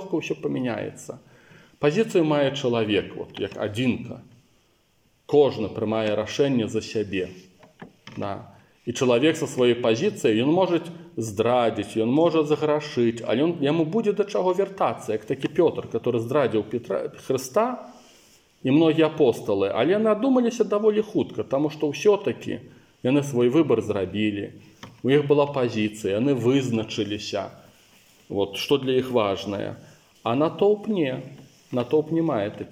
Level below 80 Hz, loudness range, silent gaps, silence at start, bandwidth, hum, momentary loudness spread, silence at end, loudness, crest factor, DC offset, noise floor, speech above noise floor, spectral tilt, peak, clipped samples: -66 dBFS; 4 LU; none; 0 s; 16 kHz; none; 12 LU; 0 s; -24 LUFS; 16 dB; under 0.1%; -64 dBFS; 41 dB; -6 dB/octave; -6 dBFS; under 0.1%